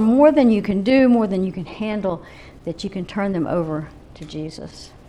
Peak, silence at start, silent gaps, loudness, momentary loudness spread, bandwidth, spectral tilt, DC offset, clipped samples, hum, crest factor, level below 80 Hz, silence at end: -2 dBFS; 0 s; none; -19 LUFS; 20 LU; 10.5 kHz; -7.5 dB/octave; under 0.1%; under 0.1%; none; 18 dB; -46 dBFS; 0.2 s